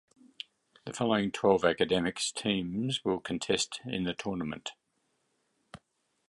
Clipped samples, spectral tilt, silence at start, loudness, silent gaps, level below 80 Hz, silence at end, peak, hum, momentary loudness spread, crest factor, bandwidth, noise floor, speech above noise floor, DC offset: under 0.1%; -4 dB/octave; 0.85 s; -31 LUFS; none; -62 dBFS; 0.55 s; -10 dBFS; none; 18 LU; 22 dB; 11.5 kHz; -77 dBFS; 47 dB; under 0.1%